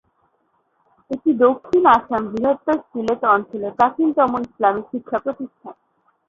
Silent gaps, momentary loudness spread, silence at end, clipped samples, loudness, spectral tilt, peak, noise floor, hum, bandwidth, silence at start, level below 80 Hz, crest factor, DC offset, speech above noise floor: none; 12 LU; 0.55 s; under 0.1%; -19 LUFS; -7 dB/octave; 0 dBFS; -66 dBFS; none; 7.4 kHz; 1.1 s; -58 dBFS; 18 dB; under 0.1%; 47 dB